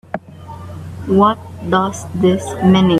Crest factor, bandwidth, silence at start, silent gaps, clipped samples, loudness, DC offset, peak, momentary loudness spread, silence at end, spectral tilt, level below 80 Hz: 16 dB; 12 kHz; 0.15 s; none; under 0.1%; -16 LUFS; under 0.1%; 0 dBFS; 18 LU; 0 s; -6.5 dB/octave; -46 dBFS